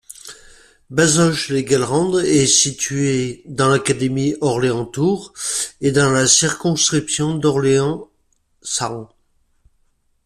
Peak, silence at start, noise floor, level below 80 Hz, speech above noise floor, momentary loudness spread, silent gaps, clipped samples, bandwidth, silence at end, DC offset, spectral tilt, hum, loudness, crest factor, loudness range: 0 dBFS; 0.1 s; -63 dBFS; -50 dBFS; 46 dB; 11 LU; none; under 0.1%; 14 kHz; 1.2 s; under 0.1%; -3.5 dB/octave; none; -17 LUFS; 18 dB; 3 LU